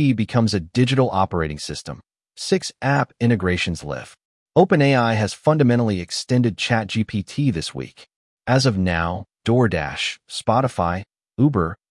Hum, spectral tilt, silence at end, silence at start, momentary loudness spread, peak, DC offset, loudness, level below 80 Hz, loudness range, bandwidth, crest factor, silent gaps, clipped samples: none; -6 dB/octave; 0.15 s; 0 s; 13 LU; -2 dBFS; under 0.1%; -20 LUFS; -48 dBFS; 3 LU; 12 kHz; 18 dB; 4.25-4.46 s, 8.16-8.37 s; under 0.1%